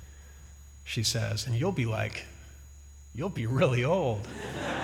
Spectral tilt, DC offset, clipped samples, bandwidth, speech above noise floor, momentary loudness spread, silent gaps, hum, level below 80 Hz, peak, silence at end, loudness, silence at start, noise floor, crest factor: -5 dB/octave; under 0.1%; under 0.1%; 16 kHz; 20 dB; 24 LU; none; none; -50 dBFS; -12 dBFS; 0 s; -30 LUFS; 0 s; -49 dBFS; 18 dB